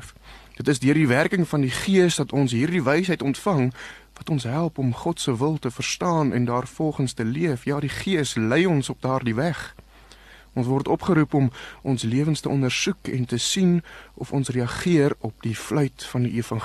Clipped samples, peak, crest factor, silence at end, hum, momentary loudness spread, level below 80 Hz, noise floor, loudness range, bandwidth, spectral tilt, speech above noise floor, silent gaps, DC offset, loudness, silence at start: under 0.1%; -6 dBFS; 18 dB; 0 s; none; 8 LU; -52 dBFS; -49 dBFS; 3 LU; 13 kHz; -5.5 dB/octave; 26 dB; none; under 0.1%; -23 LUFS; 0 s